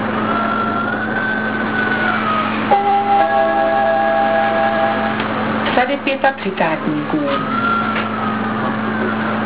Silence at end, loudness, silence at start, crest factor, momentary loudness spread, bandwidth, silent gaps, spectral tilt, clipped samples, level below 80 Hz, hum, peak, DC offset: 0 s; -17 LUFS; 0 s; 16 dB; 5 LU; 4 kHz; none; -9 dB/octave; under 0.1%; -52 dBFS; none; 0 dBFS; 0.8%